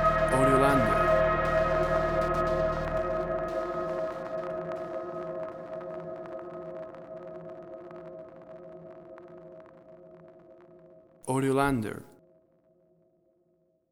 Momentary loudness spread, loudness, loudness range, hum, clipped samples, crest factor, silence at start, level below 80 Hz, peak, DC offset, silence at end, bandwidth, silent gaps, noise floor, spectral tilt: 23 LU; -28 LUFS; 20 LU; none; under 0.1%; 20 dB; 0 s; -46 dBFS; -10 dBFS; under 0.1%; 1.85 s; 16 kHz; none; -70 dBFS; -6.5 dB/octave